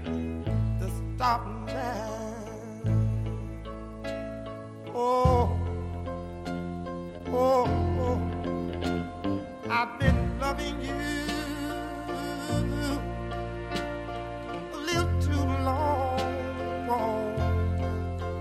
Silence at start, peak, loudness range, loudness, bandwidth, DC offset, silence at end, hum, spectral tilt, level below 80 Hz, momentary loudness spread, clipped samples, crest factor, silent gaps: 0 s; -10 dBFS; 4 LU; -30 LUFS; 14 kHz; under 0.1%; 0 s; none; -6.5 dB/octave; -38 dBFS; 11 LU; under 0.1%; 20 dB; none